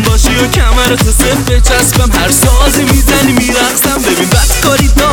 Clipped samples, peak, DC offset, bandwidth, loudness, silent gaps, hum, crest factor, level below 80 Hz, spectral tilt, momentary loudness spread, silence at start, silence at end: 0.5%; 0 dBFS; under 0.1%; over 20 kHz; -8 LUFS; none; none; 8 dB; -12 dBFS; -3.5 dB/octave; 2 LU; 0 s; 0 s